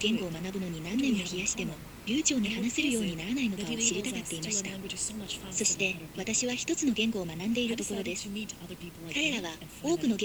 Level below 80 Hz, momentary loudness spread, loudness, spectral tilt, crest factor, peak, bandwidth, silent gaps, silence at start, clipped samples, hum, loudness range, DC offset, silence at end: -56 dBFS; 9 LU; -31 LUFS; -3 dB/octave; 22 dB; -10 dBFS; over 20 kHz; none; 0 s; under 0.1%; none; 2 LU; under 0.1%; 0 s